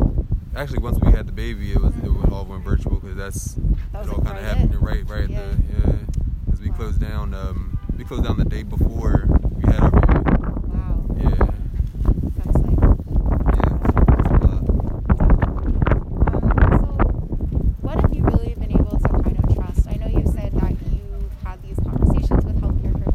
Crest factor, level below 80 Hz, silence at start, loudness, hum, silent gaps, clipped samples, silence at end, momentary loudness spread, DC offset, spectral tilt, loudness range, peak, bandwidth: 16 dB; -20 dBFS; 0 s; -21 LUFS; none; none; under 0.1%; 0 s; 10 LU; under 0.1%; -8.5 dB/octave; 5 LU; -2 dBFS; 10 kHz